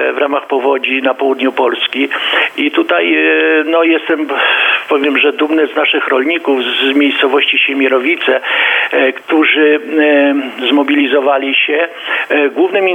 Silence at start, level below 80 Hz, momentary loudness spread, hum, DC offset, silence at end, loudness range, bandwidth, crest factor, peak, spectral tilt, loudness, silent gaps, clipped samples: 0 s; -72 dBFS; 4 LU; none; under 0.1%; 0 s; 1 LU; 9 kHz; 12 dB; 0 dBFS; -3.5 dB/octave; -11 LUFS; none; under 0.1%